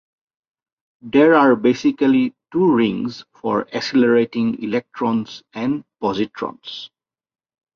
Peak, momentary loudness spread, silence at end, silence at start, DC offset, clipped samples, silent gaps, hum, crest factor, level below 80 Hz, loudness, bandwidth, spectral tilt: -2 dBFS; 15 LU; 0.9 s; 1.05 s; under 0.1%; under 0.1%; none; none; 16 dB; -62 dBFS; -18 LUFS; 7 kHz; -6.5 dB/octave